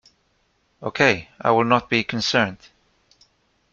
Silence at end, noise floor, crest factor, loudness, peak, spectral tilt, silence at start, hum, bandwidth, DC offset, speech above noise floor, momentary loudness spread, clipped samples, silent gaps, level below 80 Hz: 1.2 s; -66 dBFS; 22 dB; -20 LUFS; -2 dBFS; -4.5 dB/octave; 0.8 s; none; 7.6 kHz; under 0.1%; 46 dB; 8 LU; under 0.1%; none; -58 dBFS